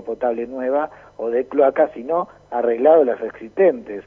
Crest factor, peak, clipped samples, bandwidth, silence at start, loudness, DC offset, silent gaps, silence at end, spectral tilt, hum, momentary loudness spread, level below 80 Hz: 16 dB; -2 dBFS; under 0.1%; 3.7 kHz; 0 s; -19 LUFS; under 0.1%; none; 0.05 s; -8.5 dB/octave; none; 13 LU; -60 dBFS